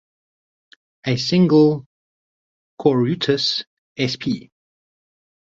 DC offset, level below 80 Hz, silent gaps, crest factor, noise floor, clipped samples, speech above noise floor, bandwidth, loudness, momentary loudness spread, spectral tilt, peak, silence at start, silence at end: under 0.1%; -60 dBFS; 1.86-2.77 s, 3.67-3.95 s; 18 dB; under -90 dBFS; under 0.1%; over 72 dB; 7.8 kHz; -19 LUFS; 14 LU; -6 dB/octave; -4 dBFS; 1.05 s; 1.1 s